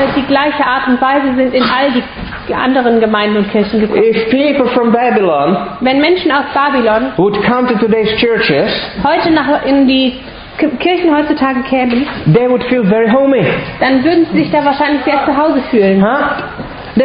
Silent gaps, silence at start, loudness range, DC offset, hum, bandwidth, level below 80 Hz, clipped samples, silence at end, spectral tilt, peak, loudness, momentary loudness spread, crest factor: none; 0 s; 1 LU; under 0.1%; none; 5.2 kHz; -38 dBFS; under 0.1%; 0 s; -11 dB/octave; 0 dBFS; -11 LUFS; 5 LU; 12 dB